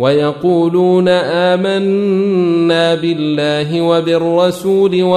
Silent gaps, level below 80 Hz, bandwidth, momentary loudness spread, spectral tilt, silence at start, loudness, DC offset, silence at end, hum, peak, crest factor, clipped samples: none; -56 dBFS; 14 kHz; 3 LU; -6.5 dB/octave; 0 s; -13 LUFS; under 0.1%; 0 s; none; -2 dBFS; 10 dB; under 0.1%